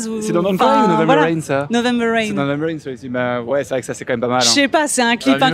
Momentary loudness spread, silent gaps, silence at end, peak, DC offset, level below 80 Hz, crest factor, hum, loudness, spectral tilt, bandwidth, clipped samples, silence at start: 10 LU; none; 0 s; -2 dBFS; under 0.1%; -56 dBFS; 16 dB; none; -16 LUFS; -4 dB/octave; 16 kHz; under 0.1%; 0 s